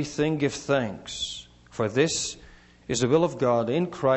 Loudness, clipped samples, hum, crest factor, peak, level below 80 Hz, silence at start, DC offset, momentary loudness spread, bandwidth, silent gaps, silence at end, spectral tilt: -26 LUFS; under 0.1%; 60 Hz at -55 dBFS; 18 dB; -8 dBFS; -54 dBFS; 0 s; under 0.1%; 13 LU; 8.4 kHz; none; 0 s; -4.5 dB/octave